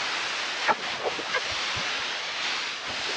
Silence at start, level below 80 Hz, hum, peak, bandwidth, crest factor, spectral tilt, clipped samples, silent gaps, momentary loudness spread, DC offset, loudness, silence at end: 0 s; -64 dBFS; none; -10 dBFS; 11.5 kHz; 18 dB; -0.5 dB/octave; under 0.1%; none; 3 LU; under 0.1%; -27 LUFS; 0 s